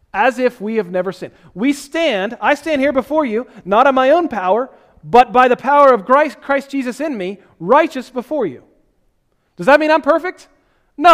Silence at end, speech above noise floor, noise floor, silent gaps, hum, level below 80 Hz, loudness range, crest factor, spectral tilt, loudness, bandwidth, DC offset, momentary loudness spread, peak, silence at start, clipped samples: 0 s; 47 dB; -62 dBFS; none; none; -52 dBFS; 5 LU; 16 dB; -5 dB/octave; -15 LUFS; 15 kHz; under 0.1%; 13 LU; 0 dBFS; 0.15 s; 0.3%